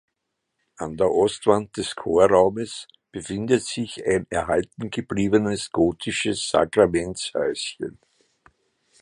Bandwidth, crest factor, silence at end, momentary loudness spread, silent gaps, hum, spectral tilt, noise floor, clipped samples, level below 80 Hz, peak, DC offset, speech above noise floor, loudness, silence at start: 11 kHz; 20 dB; 1.1 s; 14 LU; none; none; -4.5 dB/octave; -79 dBFS; under 0.1%; -50 dBFS; -2 dBFS; under 0.1%; 57 dB; -23 LUFS; 0.8 s